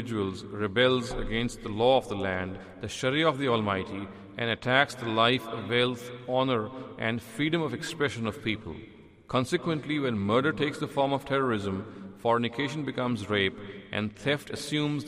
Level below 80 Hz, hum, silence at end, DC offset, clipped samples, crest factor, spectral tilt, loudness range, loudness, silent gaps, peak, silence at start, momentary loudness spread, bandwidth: -52 dBFS; none; 0 s; under 0.1%; under 0.1%; 22 dB; -5.5 dB/octave; 3 LU; -29 LUFS; none; -6 dBFS; 0 s; 11 LU; 15.5 kHz